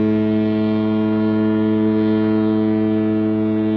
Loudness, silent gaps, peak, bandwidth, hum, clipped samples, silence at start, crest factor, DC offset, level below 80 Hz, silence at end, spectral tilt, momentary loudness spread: -18 LUFS; none; -8 dBFS; 4.8 kHz; none; under 0.1%; 0 s; 10 dB; under 0.1%; -52 dBFS; 0 s; -10.5 dB/octave; 1 LU